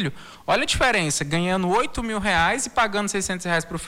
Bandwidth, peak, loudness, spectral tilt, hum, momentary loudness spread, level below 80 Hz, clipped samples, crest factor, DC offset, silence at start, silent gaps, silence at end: 16.5 kHz; -10 dBFS; -22 LUFS; -3.5 dB/octave; none; 6 LU; -42 dBFS; under 0.1%; 14 dB; under 0.1%; 0 s; none; 0 s